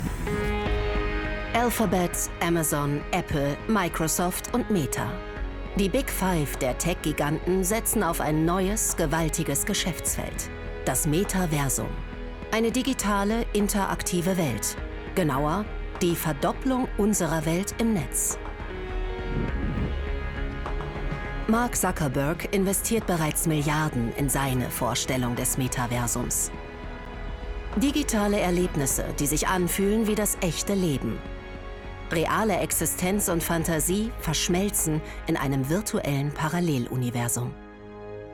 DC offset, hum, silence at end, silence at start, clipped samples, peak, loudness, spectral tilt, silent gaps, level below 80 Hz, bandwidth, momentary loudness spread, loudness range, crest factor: under 0.1%; none; 0 s; 0 s; under 0.1%; -10 dBFS; -26 LUFS; -4.5 dB/octave; none; -36 dBFS; 18 kHz; 9 LU; 3 LU; 16 dB